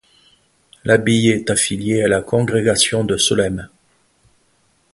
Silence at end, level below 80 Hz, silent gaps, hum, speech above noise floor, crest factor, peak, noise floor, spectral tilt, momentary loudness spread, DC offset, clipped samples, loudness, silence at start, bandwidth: 1.25 s; -46 dBFS; none; none; 44 dB; 18 dB; 0 dBFS; -60 dBFS; -4 dB/octave; 5 LU; under 0.1%; under 0.1%; -16 LUFS; 0.85 s; 12 kHz